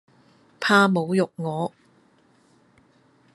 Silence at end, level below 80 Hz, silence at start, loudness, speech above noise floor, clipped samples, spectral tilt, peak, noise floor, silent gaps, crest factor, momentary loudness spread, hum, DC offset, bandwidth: 1.65 s; -74 dBFS; 0.6 s; -22 LUFS; 39 dB; under 0.1%; -5.5 dB/octave; -4 dBFS; -60 dBFS; none; 22 dB; 12 LU; none; under 0.1%; 12 kHz